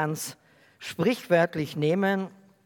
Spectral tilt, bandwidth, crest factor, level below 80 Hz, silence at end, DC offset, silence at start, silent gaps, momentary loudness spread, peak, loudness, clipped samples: -5.5 dB/octave; 18 kHz; 18 dB; -74 dBFS; 0.35 s; under 0.1%; 0 s; none; 15 LU; -8 dBFS; -26 LUFS; under 0.1%